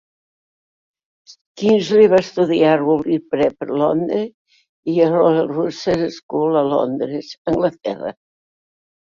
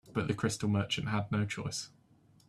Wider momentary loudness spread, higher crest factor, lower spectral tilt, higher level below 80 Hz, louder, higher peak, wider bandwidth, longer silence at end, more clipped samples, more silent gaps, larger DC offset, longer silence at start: first, 12 LU vs 8 LU; about the same, 16 dB vs 18 dB; first, -7 dB/octave vs -5 dB/octave; first, -56 dBFS vs -62 dBFS; first, -17 LUFS vs -34 LUFS; first, -2 dBFS vs -18 dBFS; second, 7.4 kHz vs 13 kHz; first, 0.9 s vs 0.6 s; neither; first, 1.41-1.55 s, 4.34-4.45 s, 4.69-4.83 s, 6.23-6.29 s, 7.38-7.45 s vs none; neither; first, 1.3 s vs 0.05 s